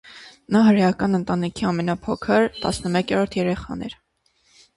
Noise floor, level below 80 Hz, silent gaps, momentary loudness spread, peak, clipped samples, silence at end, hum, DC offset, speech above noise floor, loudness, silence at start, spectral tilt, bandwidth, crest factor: -63 dBFS; -48 dBFS; none; 13 LU; -6 dBFS; under 0.1%; 0.85 s; none; under 0.1%; 43 dB; -21 LUFS; 0.05 s; -6.5 dB/octave; 11.5 kHz; 16 dB